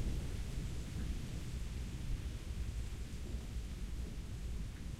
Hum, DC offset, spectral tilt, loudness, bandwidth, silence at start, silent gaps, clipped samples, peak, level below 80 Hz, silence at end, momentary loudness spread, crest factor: none; under 0.1%; -5.5 dB/octave; -45 LUFS; 15 kHz; 0 s; none; under 0.1%; -28 dBFS; -44 dBFS; 0 s; 3 LU; 14 dB